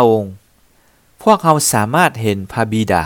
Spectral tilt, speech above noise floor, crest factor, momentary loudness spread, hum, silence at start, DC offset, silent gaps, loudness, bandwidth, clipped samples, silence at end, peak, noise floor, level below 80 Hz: -4.5 dB/octave; 39 dB; 16 dB; 8 LU; none; 0 s; under 0.1%; none; -15 LUFS; 19 kHz; 0.1%; 0 s; 0 dBFS; -53 dBFS; -48 dBFS